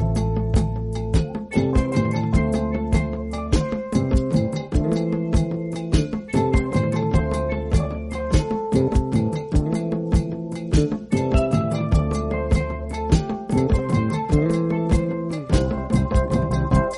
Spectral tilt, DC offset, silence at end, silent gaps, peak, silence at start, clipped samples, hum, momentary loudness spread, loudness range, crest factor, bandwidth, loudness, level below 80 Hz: -7.5 dB/octave; under 0.1%; 0 s; none; -4 dBFS; 0 s; under 0.1%; none; 4 LU; 1 LU; 16 dB; 11.5 kHz; -22 LUFS; -26 dBFS